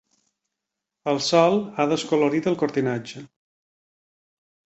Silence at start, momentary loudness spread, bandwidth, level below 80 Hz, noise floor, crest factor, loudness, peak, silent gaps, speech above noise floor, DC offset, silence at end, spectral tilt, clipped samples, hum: 1.05 s; 14 LU; 8.2 kHz; -66 dBFS; -84 dBFS; 20 dB; -22 LUFS; -4 dBFS; none; 62 dB; under 0.1%; 1.4 s; -5 dB/octave; under 0.1%; none